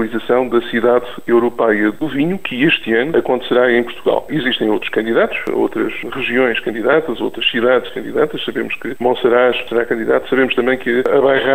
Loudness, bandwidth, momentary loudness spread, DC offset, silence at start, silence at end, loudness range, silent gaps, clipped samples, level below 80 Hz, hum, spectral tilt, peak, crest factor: -16 LUFS; 15.5 kHz; 5 LU; 2%; 0 s; 0 s; 2 LU; none; under 0.1%; -48 dBFS; none; -6 dB/octave; -2 dBFS; 14 dB